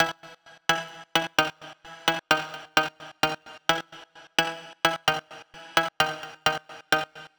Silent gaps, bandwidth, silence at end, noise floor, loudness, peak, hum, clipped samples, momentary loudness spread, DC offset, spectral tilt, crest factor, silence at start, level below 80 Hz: none; over 20 kHz; 0.1 s; -50 dBFS; -27 LUFS; -6 dBFS; none; under 0.1%; 13 LU; under 0.1%; -2 dB/octave; 22 dB; 0 s; -62 dBFS